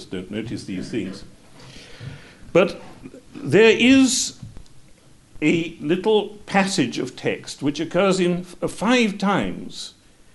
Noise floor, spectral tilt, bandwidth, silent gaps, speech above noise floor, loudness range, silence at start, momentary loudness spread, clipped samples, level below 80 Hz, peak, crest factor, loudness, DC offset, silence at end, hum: -51 dBFS; -4.5 dB/octave; 11.5 kHz; none; 30 dB; 4 LU; 0 s; 23 LU; under 0.1%; -50 dBFS; -4 dBFS; 18 dB; -20 LUFS; 0.3%; 0.45 s; none